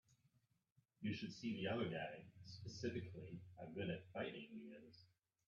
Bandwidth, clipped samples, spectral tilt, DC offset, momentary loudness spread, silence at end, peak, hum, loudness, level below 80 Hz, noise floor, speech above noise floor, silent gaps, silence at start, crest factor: 7.6 kHz; under 0.1%; -6 dB/octave; under 0.1%; 15 LU; 0.45 s; -32 dBFS; none; -49 LUFS; -80 dBFS; -82 dBFS; 34 dB; 0.72-0.76 s; 0.1 s; 18 dB